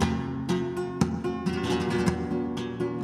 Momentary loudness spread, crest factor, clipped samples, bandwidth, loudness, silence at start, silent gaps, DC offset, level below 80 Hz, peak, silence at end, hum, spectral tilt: 5 LU; 18 dB; under 0.1%; 13.5 kHz; -29 LUFS; 0 s; none; under 0.1%; -46 dBFS; -8 dBFS; 0 s; none; -6.5 dB/octave